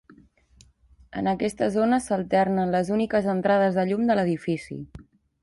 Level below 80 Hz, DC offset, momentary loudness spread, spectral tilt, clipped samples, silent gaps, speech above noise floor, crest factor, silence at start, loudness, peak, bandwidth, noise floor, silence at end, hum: -56 dBFS; under 0.1%; 10 LU; -7 dB/octave; under 0.1%; none; 34 dB; 16 dB; 1.15 s; -24 LUFS; -10 dBFS; 11.5 kHz; -57 dBFS; 0.4 s; none